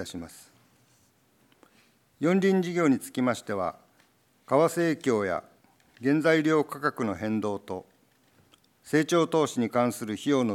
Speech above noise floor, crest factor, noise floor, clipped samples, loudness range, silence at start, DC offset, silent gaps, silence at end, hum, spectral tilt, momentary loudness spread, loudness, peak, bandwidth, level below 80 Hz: 39 dB; 18 dB; -65 dBFS; under 0.1%; 2 LU; 0 s; under 0.1%; none; 0 s; none; -6 dB/octave; 11 LU; -27 LUFS; -10 dBFS; 16.5 kHz; -74 dBFS